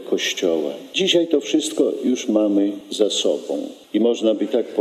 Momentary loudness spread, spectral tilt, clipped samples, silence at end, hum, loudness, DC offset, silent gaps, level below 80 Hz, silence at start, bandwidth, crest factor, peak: 7 LU; -3.5 dB/octave; under 0.1%; 0 s; none; -20 LUFS; under 0.1%; none; -80 dBFS; 0 s; 14 kHz; 16 dB; -4 dBFS